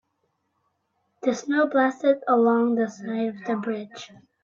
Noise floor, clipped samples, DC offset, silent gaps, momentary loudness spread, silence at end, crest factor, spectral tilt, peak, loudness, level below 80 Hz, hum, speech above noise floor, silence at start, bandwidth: -74 dBFS; under 0.1%; under 0.1%; none; 13 LU; 0.4 s; 16 dB; -5.5 dB/octave; -8 dBFS; -24 LUFS; -76 dBFS; none; 51 dB; 1.25 s; 7.6 kHz